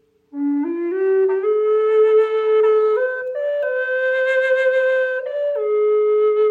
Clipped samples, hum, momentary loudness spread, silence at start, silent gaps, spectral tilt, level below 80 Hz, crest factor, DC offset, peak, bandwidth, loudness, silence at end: under 0.1%; none; 7 LU; 0.35 s; none; -4 dB/octave; -76 dBFS; 10 dB; under 0.1%; -8 dBFS; 4.5 kHz; -18 LUFS; 0 s